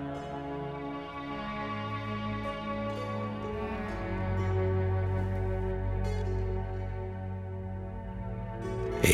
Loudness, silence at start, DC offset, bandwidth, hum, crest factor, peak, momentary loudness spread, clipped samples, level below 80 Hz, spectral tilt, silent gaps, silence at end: -34 LUFS; 0 s; under 0.1%; 13 kHz; none; 24 dB; -8 dBFS; 8 LU; under 0.1%; -42 dBFS; -6 dB/octave; none; 0 s